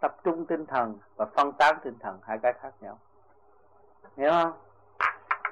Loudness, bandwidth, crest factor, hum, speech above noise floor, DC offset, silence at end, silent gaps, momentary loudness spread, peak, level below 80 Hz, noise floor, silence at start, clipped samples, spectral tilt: -28 LUFS; 11 kHz; 18 dB; none; 34 dB; under 0.1%; 0 s; none; 17 LU; -10 dBFS; -70 dBFS; -62 dBFS; 0 s; under 0.1%; -5 dB/octave